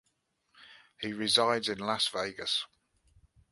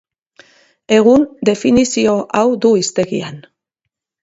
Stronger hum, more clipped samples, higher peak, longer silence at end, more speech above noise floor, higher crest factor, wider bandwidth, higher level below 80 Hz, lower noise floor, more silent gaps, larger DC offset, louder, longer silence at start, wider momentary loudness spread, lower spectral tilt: neither; neither; second, -10 dBFS vs 0 dBFS; about the same, 0.85 s vs 0.85 s; second, 46 dB vs 65 dB; first, 24 dB vs 14 dB; first, 11.5 kHz vs 8 kHz; second, -70 dBFS vs -50 dBFS; about the same, -77 dBFS vs -78 dBFS; neither; neither; second, -30 LUFS vs -14 LUFS; second, 0.6 s vs 0.9 s; first, 14 LU vs 9 LU; second, -2.5 dB/octave vs -4.5 dB/octave